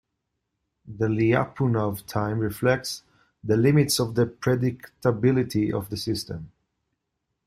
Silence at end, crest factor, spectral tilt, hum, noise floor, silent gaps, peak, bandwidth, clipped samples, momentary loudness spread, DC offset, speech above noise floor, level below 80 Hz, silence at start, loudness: 1 s; 18 dB; -6 dB/octave; none; -80 dBFS; none; -8 dBFS; 16 kHz; under 0.1%; 11 LU; under 0.1%; 56 dB; -56 dBFS; 0.85 s; -24 LUFS